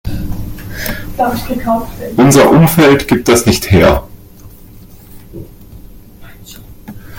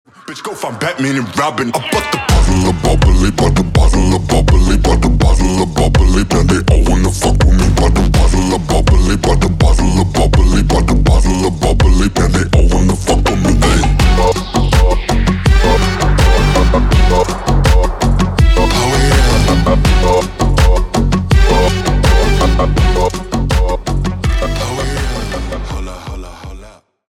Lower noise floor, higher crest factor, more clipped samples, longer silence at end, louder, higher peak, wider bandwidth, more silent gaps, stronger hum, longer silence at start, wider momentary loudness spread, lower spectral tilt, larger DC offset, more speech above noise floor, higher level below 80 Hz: about the same, -35 dBFS vs -38 dBFS; about the same, 12 dB vs 10 dB; neither; second, 0 s vs 0.4 s; about the same, -11 LUFS vs -13 LUFS; about the same, 0 dBFS vs 0 dBFS; first, 17 kHz vs 13.5 kHz; neither; neither; second, 0.05 s vs 0.3 s; first, 23 LU vs 7 LU; about the same, -5.5 dB/octave vs -5.5 dB/octave; neither; about the same, 26 dB vs 28 dB; second, -30 dBFS vs -14 dBFS